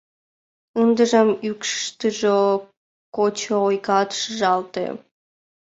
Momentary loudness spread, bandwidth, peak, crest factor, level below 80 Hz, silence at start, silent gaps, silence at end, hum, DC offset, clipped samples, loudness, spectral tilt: 12 LU; 8 kHz; -4 dBFS; 18 dB; -68 dBFS; 0.75 s; 2.77-3.12 s; 0.8 s; none; under 0.1%; under 0.1%; -21 LUFS; -4 dB/octave